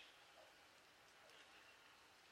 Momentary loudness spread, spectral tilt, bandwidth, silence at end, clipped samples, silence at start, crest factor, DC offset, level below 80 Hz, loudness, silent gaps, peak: 3 LU; -1 dB/octave; 16 kHz; 0 s; under 0.1%; 0 s; 18 dB; under 0.1%; under -90 dBFS; -65 LUFS; none; -48 dBFS